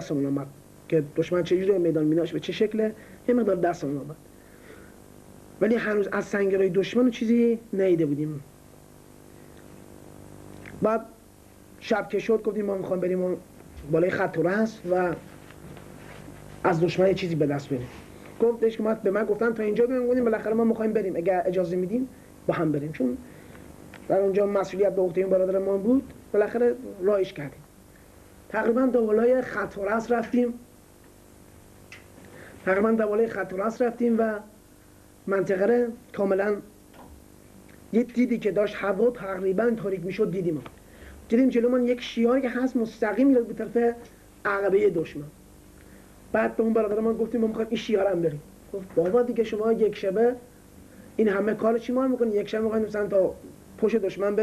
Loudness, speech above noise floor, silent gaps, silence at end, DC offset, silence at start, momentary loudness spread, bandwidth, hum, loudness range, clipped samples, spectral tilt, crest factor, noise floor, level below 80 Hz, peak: -25 LUFS; 28 dB; none; 0 s; under 0.1%; 0 s; 16 LU; 13.5 kHz; none; 4 LU; under 0.1%; -7 dB/octave; 16 dB; -53 dBFS; -58 dBFS; -8 dBFS